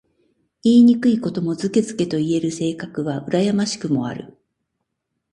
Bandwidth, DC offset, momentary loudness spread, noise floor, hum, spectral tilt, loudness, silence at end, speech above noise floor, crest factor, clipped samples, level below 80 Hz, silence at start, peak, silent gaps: 10 kHz; under 0.1%; 12 LU; -77 dBFS; none; -6 dB/octave; -19 LUFS; 1 s; 59 dB; 16 dB; under 0.1%; -60 dBFS; 0.65 s; -4 dBFS; none